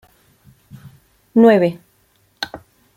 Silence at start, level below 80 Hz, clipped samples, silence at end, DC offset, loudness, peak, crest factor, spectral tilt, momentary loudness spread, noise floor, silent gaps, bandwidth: 1.35 s; -60 dBFS; under 0.1%; 0.4 s; under 0.1%; -16 LUFS; -2 dBFS; 18 dB; -7 dB/octave; 18 LU; -59 dBFS; none; 15.5 kHz